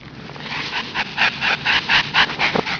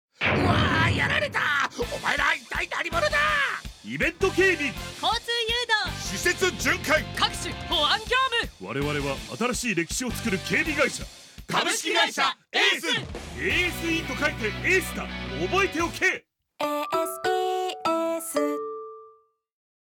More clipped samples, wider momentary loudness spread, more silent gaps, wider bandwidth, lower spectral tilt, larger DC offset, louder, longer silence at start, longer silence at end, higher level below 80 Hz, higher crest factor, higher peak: neither; first, 12 LU vs 9 LU; neither; second, 5.4 kHz vs 19 kHz; about the same, -3 dB/octave vs -3.5 dB/octave; neither; first, -18 LUFS vs -25 LUFS; second, 0 s vs 0.2 s; second, 0 s vs 0.9 s; second, -50 dBFS vs -44 dBFS; about the same, 18 dB vs 20 dB; first, -2 dBFS vs -6 dBFS